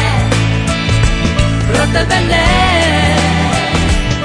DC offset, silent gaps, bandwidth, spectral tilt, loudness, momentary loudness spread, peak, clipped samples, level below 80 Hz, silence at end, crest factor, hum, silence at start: under 0.1%; none; 10 kHz; -5 dB/octave; -12 LUFS; 4 LU; 0 dBFS; under 0.1%; -20 dBFS; 0 s; 12 dB; none; 0 s